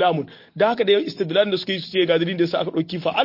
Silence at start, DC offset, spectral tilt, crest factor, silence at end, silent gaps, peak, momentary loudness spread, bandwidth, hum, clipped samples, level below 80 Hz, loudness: 0 s; under 0.1%; -7 dB/octave; 16 dB; 0 s; none; -6 dBFS; 5 LU; 5.8 kHz; none; under 0.1%; -66 dBFS; -21 LUFS